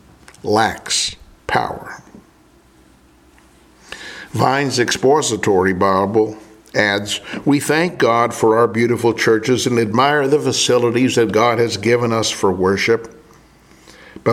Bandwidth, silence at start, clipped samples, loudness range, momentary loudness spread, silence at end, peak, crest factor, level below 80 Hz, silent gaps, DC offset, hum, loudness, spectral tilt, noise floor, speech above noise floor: 16 kHz; 0.45 s; under 0.1%; 9 LU; 11 LU; 0 s; 0 dBFS; 18 dB; -52 dBFS; none; under 0.1%; none; -16 LUFS; -4 dB/octave; -50 dBFS; 34 dB